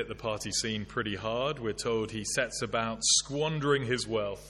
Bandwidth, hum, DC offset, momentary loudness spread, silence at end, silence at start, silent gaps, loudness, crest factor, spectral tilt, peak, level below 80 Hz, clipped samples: 13 kHz; none; under 0.1%; 8 LU; 0 s; 0 s; none; -30 LUFS; 20 dB; -3 dB/octave; -12 dBFS; -54 dBFS; under 0.1%